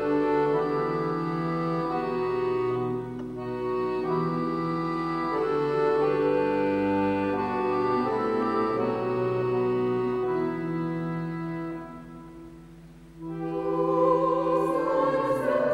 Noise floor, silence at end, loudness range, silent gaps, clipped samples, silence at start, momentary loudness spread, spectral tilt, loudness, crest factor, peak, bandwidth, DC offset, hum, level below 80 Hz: -48 dBFS; 0 s; 5 LU; none; under 0.1%; 0 s; 10 LU; -8.5 dB/octave; -27 LUFS; 16 dB; -10 dBFS; 11.5 kHz; under 0.1%; none; -56 dBFS